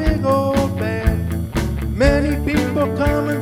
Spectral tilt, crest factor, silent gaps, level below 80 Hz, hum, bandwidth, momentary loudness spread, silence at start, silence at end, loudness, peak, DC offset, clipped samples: -7 dB/octave; 16 dB; none; -24 dBFS; none; 17 kHz; 6 LU; 0 s; 0 s; -19 LUFS; -2 dBFS; under 0.1%; under 0.1%